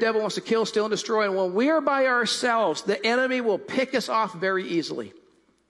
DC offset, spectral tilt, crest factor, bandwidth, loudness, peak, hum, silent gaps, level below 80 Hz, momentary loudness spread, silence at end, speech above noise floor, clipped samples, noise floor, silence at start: under 0.1%; -3.5 dB/octave; 14 dB; 12 kHz; -24 LUFS; -10 dBFS; none; none; -76 dBFS; 5 LU; 0.5 s; 37 dB; under 0.1%; -61 dBFS; 0 s